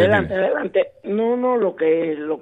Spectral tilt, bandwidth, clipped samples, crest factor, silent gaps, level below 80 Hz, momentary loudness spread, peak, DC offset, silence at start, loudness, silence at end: -8 dB/octave; 7.4 kHz; under 0.1%; 16 dB; none; -52 dBFS; 4 LU; -2 dBFS; under 0.1%; 0 s; -20 LUFS; 0 s